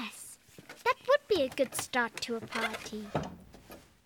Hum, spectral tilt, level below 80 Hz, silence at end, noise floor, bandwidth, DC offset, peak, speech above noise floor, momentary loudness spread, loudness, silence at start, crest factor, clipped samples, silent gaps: none; -3.5 dB/octave; -62 dBFS; 0.25 s; -54 dBFS; 19 kHz; under 0.1%; -14 dBFS; 20 dB; 24 LU; -32 LUFS; 0 s; 20 dB; under 0.1%; none